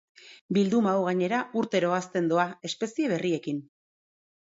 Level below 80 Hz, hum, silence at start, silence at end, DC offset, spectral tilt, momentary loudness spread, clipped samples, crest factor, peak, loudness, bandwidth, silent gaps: -74 dBFS; none; 0.25 s; 0.95 s; under 0.1%; -6 dB/octave; 7 LU; under 0.1%; 18 dB; -10 dBFS; -27 LUFS; 8 kHz; 0.41-0.49 s